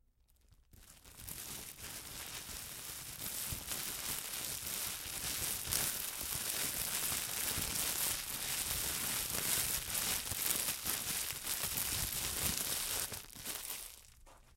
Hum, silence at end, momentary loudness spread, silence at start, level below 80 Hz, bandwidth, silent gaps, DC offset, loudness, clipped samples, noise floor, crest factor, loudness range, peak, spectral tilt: none; 0.05 s; 11 LU; 0.5 s; -58 dBFS; 17 kHz; none; under 0.1%; -36 LUFS; under 0.1%; -70 dBFS; 30 dB; 7 LU; -10 dBFS; -0.5 dB/octave